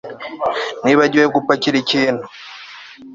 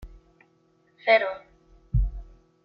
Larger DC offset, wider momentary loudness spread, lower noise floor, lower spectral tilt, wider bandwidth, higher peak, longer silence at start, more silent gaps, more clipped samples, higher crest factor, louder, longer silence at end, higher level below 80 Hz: neither; about the same, 21 LU vs 19 LU; second, -37 dBFS vs -64 dBFS; second, -4.5 dB/octave vs -7.5 dB/octave; first, 7.6 kHz vs 5.6 kHz; first, 0 dBFS vs -8 dBFS; about the same, 0.05 s vs 0 s; neither; neither; about the same, 16 dB vs 20 dB; first, -16 LUFS vs -25 LUFS; second, 0 s vs 0.4 s; second, -58 dBFS vs -34 dBFS